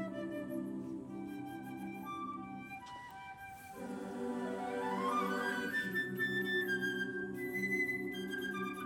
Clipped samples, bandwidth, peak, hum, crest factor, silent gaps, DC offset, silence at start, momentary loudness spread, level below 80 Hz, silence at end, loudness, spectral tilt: under 0.1%; 18 kHz; -24 dBFS; none; 16 dB; none; under 0.1%; 0 s; 13 LU; -74 dBFS; 0 s; -39 LUFS; -5 dB/octave